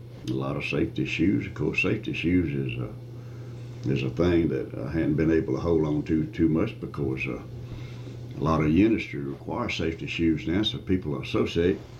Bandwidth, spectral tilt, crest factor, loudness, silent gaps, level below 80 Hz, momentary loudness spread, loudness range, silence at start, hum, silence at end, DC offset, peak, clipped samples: 8.2 kHz; -7 dB/octave; 16 dB; -26 LUFS; none; -48 dBFS; 15 LU; 2 LU; 0 s; none; 0 s; under 0.1%; -10 dBFS; under 0.1%